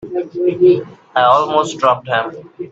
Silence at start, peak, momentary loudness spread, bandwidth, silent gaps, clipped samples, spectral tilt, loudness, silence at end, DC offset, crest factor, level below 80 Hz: 0 s; 0 dBFS; 11 LU; 8 kHz; none; under 0.1%; -5.5 dB/octave; -15 LUFS; 0.05 s; under 0.1%; 14 dB; -58 dBFS